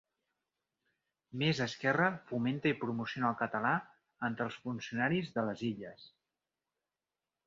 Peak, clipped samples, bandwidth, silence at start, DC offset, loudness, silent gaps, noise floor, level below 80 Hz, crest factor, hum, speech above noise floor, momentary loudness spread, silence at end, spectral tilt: -16 dBFS; under 0.1%; 7.4 kHz; 1.35 s; under 0.1%; -35 LUFS; none; under -90 dBFS; -74 dBFS; 22 dB; none; over 55 dB; 8 LU; 1.4 s; -4 dB/octave